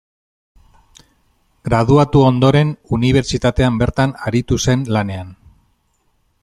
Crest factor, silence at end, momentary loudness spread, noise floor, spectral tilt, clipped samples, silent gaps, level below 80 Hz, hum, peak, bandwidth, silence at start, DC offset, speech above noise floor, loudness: 16 dB; 1.1 s; 9 LU; -62 dBFS; -6.5 dB/octave; under 0.1%; none; -34 dBFS; none; -2 dBFS; 12.5 kHz; 1.65 s; under 0.1%; 48 dB; -15 LUFS